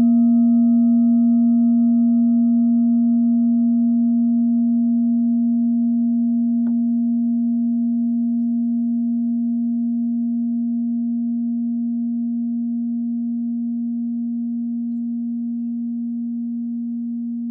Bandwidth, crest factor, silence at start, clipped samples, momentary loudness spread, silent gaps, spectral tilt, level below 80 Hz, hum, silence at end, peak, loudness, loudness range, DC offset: 1.3 kHz; 8 dB; 0 s; under 0.1%; 10 LU; none; -14 dB/octave; -86 dBFS; none; 0 s; -10 dBFS; -19 LUFS; 8 LU; under 0.1%